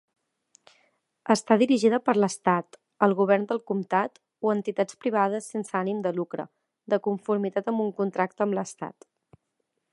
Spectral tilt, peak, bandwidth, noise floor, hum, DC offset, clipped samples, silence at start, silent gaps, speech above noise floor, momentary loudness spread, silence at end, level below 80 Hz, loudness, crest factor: -6 dB/octave; -4 dBFS; 11.5 kHz; -79 dBFS; none; under 0.1%; under 0.1%; 1.25 s; none; 54 dB; 11 LU; 1.05 s; -78 dBFS; -26 LUFS; 22 dB